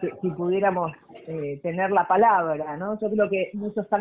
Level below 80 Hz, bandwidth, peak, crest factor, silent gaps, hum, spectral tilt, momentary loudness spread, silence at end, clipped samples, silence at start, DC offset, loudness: -66 dBFS; 3.8 kHz; -8 dBFS; 16 dB; none; none; -10.5 dB/octave; 13 LU; 0 s; under 0.1%; 0 s; under 0.1%; -24 LUFS